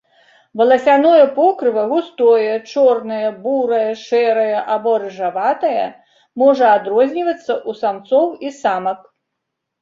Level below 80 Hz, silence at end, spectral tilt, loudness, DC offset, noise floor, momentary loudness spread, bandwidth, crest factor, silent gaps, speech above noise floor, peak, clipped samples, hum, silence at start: -68 dBFS; 0.85 s; -5.5 dB/octave; -16 LUFS; under 0.1%; -77 dBFS; 10 LU; 7.6 kHz; 14 dB; none; 62 dB; -2 dBFS; under 0.1%; none; 0.55 s